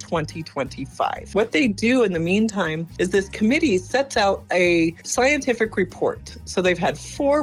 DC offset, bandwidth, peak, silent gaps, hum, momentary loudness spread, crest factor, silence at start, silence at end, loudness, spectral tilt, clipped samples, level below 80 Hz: under 0.1%; 14 kHz; -6 dBFS; none; none; 8 LU; 14 dB; 0 s; 0 s; -21 LUFS; -4.5 dB/octave; under 0.1%; -46 dBFS